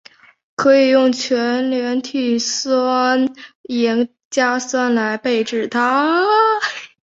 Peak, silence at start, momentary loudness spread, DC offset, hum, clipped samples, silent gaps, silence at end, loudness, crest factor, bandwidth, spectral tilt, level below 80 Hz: -2 dBFS; 0.6 s; 7 LU; under 0.1%; none; under 0.1%; 3.55-3.64 s, 4.25-4.31 s; 0.2 s; -17 LUFS; 14 dB; 8 kHz; -3 dB/octave; -66 dBFS